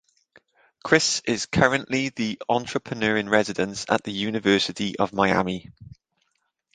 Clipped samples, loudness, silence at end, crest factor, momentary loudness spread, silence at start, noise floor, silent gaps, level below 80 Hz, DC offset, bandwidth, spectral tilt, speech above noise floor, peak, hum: under 0.1%; -23 LUFS; 0.85 s; 24 dB; 8 LU; 0.85 s; -74 dBFS; none; -54 dBFS; under 0.1%; 9.8 kHz; -4 dB/octave; 50 dB; -2 dBFS; none